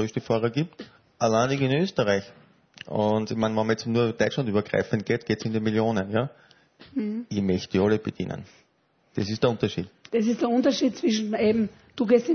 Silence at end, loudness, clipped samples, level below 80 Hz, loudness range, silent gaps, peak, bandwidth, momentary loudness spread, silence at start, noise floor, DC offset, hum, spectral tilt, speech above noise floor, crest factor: 0 s; -25 LUFS; under 0.1%; -60 dBFS; 3 LU; none; -8 dBFS; 6.6 kHz; 9 LU; 0 s; -66 dBFS; under 0.1%; none; -6 dB/octave; 42 dB; 18 dB